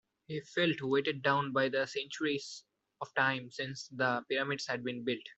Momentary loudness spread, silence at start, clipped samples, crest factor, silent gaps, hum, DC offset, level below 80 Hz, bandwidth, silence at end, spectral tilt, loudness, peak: 10 LU; 0.3 s; under 0.1%; 20 dB; none; none; under 0.1%; -78 dBFS; 8.2 kHz; 0.05 s; -4.5 dB/octave; -34 LUFS; -14 dBFS